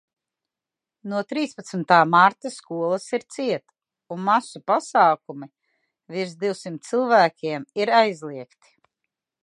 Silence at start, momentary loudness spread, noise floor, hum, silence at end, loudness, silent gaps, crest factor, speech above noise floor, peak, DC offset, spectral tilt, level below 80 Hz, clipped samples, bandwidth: 1.05 s; 17 LU; -88 dBFS; none; 1 s; -22 LUFS; none; 22 dB; 66 dB; -2 dBFS; under 0.1%; -5 dB/octave; -80 dBFS; under 0.1%; 11.5 kHz